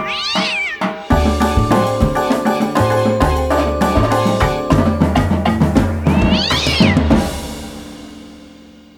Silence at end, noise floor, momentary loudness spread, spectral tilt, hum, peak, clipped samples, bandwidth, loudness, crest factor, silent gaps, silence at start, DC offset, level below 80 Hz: 0.45 s; -40 dBFS; 9 LU; -6 dB/octave; none; 0 dBFS; under 0.1%; 19 kHz; -15 LUFS; 14 dB; none; 0 s; under 0.1%; -24 dBFS